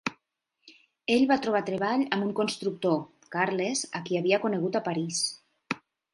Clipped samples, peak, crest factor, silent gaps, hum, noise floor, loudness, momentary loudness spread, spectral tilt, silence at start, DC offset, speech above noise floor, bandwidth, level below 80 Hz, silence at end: under 0.1%; -8 dBFS; 22 dB; none; none; -76 dBFS; -28 LUFS; 12 LU; -4 dB/octave; 0.05 s; under 0.1%; 49 dB; 11.5 kHz; -72 dBFS; 0.35 s